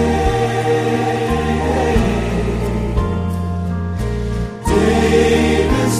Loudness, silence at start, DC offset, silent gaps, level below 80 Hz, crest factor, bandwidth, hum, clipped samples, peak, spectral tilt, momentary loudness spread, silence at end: -17 LUFS; 0 s; under 0.1%; none; -24 dBFS; 14 dB; 15 kHz; none; under 0.1%; -2 dBFS; -6 dB/octave; 8 LU; 0 s